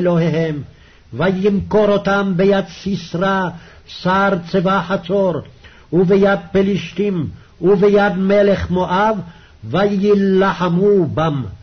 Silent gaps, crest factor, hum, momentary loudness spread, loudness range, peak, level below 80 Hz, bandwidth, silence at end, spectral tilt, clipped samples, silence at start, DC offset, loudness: none; 12 dB; none; 10 LU; 2 LU; -4 dBFS; -42 dBFS; 6.4 kHz; 0.05 s; -7.5 dB/octave; under 0.1%; 0 s; 0.2%; -16 LUFS